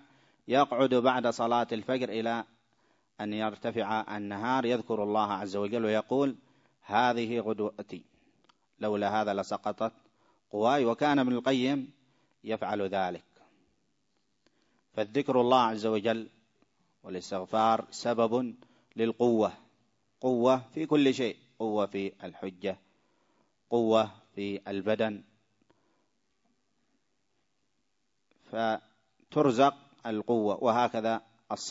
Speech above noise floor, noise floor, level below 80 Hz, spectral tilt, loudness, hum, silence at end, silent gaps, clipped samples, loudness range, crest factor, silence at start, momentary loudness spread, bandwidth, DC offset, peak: 52 dB; -81 dBFS; -76 dBFS; -5.5 dB/octave; -30 LUFS; none; 0 s; none; under 0.1%; 6 LU; 22 dB; 0.5 s; 13 LU; 8 kHz; under 0.1%; -10 dBFS